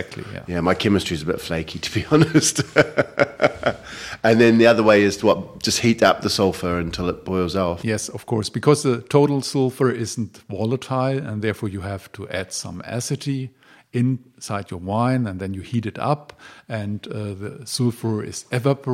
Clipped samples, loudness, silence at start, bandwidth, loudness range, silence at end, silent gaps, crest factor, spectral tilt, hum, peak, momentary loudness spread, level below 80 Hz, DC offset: under 0.1%; -21 LUFS; 0 s; 16 kHz; 9 LU; 0 s; none; 20 dB; -5 dB/octave; none; 0 dBFS; 13 LU; -50 dBFS; under 0.1%